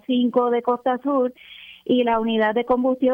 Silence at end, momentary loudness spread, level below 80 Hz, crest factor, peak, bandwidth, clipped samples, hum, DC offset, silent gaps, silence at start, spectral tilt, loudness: 0 s; 10 LU; -58 dBFS; 14 dB; -6 dBFS; 3.7 kHz; under 0.1%; none; under 0.1%; none; 0.1 s; -7.5 dB/octave; -21 LUFS